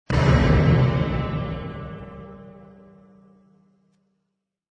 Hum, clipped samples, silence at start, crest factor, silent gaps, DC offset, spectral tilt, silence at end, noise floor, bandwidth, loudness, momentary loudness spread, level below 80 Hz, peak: none; under 0.1%; 0.1 s; 18 dB; none; under 0.1%; -8 dB/octave; 2.2 s; -78 dBFS; 7.8 kHz; -21 LUFS; 23 LU; -32 dBFS; -6 dBFS